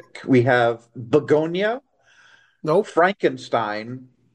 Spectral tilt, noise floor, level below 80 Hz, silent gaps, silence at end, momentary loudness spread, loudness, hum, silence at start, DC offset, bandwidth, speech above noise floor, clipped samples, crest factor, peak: -7 dB/octave; -54 dBFS; -66 dBFS; none; 0.3 s; 14 LU; -20 LUFS; none; 0.15 s; under 0.1%; 9.8 kHz; 34 dB; under 0.1%; 18 dB; -4 dBFS